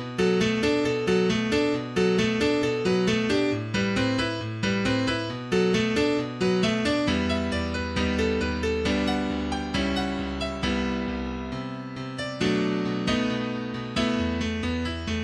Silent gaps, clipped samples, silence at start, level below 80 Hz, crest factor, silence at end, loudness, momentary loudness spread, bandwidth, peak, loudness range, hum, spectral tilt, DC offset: none; under 0.1%; 0 s; -42 dBFS; 14 dB; 0 s; -26 LUFS; 6 LU; 11.5 kHz; -10 dBFS; 4 LU; none; -5.5 dB/octave; under 0.1%